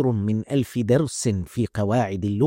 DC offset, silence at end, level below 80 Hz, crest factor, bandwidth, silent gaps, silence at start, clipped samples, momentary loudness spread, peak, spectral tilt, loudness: under 0.1%; 0 s; -52 dBFS; 16 dB; 16.5 kHz; none; 0 s; under 0.1%; 4 LU; -6 dBFS; -6.5 dB/octave; -23 LUFS